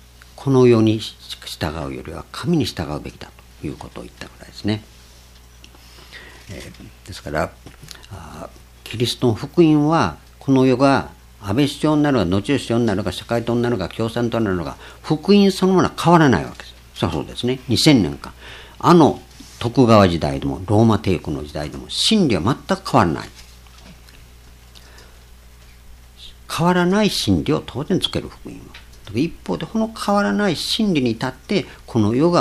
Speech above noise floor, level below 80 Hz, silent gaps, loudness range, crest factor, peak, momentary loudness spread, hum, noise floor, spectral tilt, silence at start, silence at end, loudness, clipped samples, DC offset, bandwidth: 27 dB; -42 dBFS; none; 15 LU; 20 dB; 0 dBFS; 22 LU; none; -45 dBFS; -6 dB/octave; 0.35 s; 0 s; -18 LUFS; under 0.1%; under 0.1%; 14.5 kHz